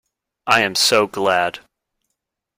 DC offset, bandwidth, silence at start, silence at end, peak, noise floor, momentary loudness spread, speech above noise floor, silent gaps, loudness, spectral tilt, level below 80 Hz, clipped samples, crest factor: under 0.1%; 16.5 kHz; 0.45 s; 1 s; 0 dBFS; -78 dBFS; 9 LU; 61 dB; none; -16 LUFS; -2 dB/octave; -58 dBFS; under 0.1%; 20 dB